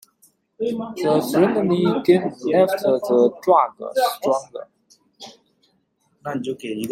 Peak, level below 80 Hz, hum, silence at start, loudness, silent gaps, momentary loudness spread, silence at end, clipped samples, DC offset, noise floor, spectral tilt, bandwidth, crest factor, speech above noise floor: -2 dBFS; -66 dBFS; none; 0.6 s; -20 LUFS; none; 17 LU; 0 s; under 0.1%; under 0.1%; -66 dBFS; -6 dB/octave; 16 kHz; 18 dB; 47 dB